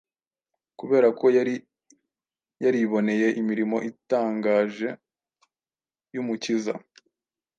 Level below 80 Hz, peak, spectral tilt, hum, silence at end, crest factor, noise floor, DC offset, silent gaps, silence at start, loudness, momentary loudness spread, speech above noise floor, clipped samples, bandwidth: -78 dBFS; -8 dBFS; -6 dB/octave; none; 0.8 s; 18 dB; under -90 dBFS; under 0.1%; none; 0.8 s; -24 LUFS; 13 LU; over 67 dB; under 0.1%; 8.8 kHz